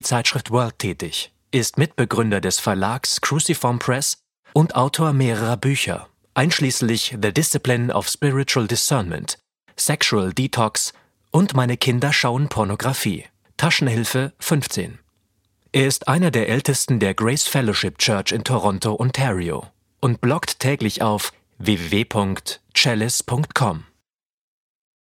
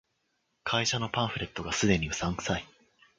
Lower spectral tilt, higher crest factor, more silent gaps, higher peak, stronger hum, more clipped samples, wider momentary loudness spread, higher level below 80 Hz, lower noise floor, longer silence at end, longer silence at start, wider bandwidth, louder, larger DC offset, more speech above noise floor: about the same, -4 dB/octave vs -4 dB/octave; about the same, 18 dB vs 22 dB; first, 4.39-4.43 s vs none; first, -2 dBFS vs -10 dBFS; neither; neither; about the same, 8 LU vs 8 LU; about the same, -52 dBFS vs -50 dBFS; about the same, -74 dBFS vs -77 dBFS; first, 1.25 s vs 0.55 s; second, 0.05 s vs 0.65 s; first, 16.5 kHz vs 9.6 kHz; first, -20 LUFS vs -30 LUFS; neither; first, 55 dB vs 47 dB